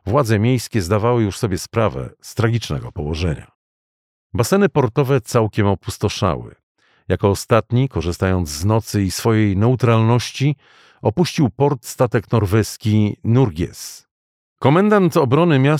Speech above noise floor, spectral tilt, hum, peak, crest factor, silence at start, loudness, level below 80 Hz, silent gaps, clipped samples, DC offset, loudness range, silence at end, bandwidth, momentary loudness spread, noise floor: over 73 dB; -6.5 dB/octave; none; -2 dBFS; 16 dB; 0.05 s; -18 LUFS; -42 dBFS; 3.55-4.30 s, 6.63-6.75 s, 14.11-14.56 s; under 0.1%; under 0.1%; 3 LU; 0 s; 16 kHz; 9 LU; under -90 dBFS